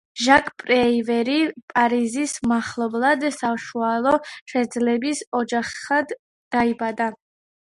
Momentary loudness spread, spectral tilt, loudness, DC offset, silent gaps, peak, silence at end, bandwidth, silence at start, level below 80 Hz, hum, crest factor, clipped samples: 8 LU; -3.5 dB/octave; -21 LUFS; under 0.1%; 1.63-1.68 s, 4.41-4.46 s, 5.27-5.32 s, 6.19-6.51 s; 0 dBFS; 0.5 s; 11.5 kHz; 0.15 s; -58 dBFS; none; 22 dB; under 0.1%